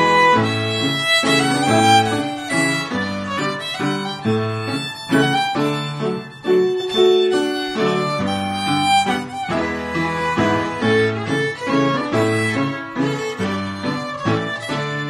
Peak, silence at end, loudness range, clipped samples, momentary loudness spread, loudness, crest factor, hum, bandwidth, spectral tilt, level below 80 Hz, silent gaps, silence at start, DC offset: -2 dBFS; 0 s; 4 LU; under 0.1%; 9 LU; -19 LUFS; 16 dB; none; 15 kHz; -4.5 dB/octave; -52 dBFS; none; 0 s; under 0.1%